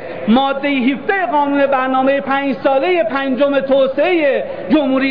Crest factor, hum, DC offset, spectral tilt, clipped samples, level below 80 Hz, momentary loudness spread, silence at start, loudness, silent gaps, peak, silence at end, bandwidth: 10 dB; none; 1%; -8 dB/octave; under 0.1%; -52 dBFS; 3 LU; 0 s; -15 LUFS; none; -4 dBFS; 0 s; 5.2 kHz